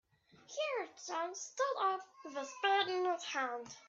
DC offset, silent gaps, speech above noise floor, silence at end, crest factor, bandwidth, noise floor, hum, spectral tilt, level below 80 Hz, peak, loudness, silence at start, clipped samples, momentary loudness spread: under 0.1%; none; 25 dB; 0 s; 18 dB; 7.8 kHz; -62 dBFS; none; -1 dB/octave; -90 dBFS; -20 dBFS; -37 LUFS; 0.5 s; under 0.1%; 12 LU